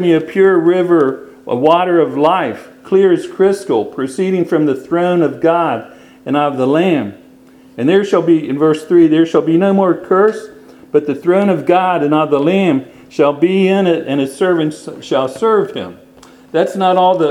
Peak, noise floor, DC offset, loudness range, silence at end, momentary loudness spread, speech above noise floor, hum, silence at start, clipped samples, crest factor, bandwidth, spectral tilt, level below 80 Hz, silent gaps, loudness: 0 dBFS; -42 dBFS; under 0.1%; 3 LU; 0 s; 9 LU; 30 dB; none; 0 s; under 0.1%; 14 dB; 12 kHz; -7 dB/octave; -60 dBFS; none; -13 LUFS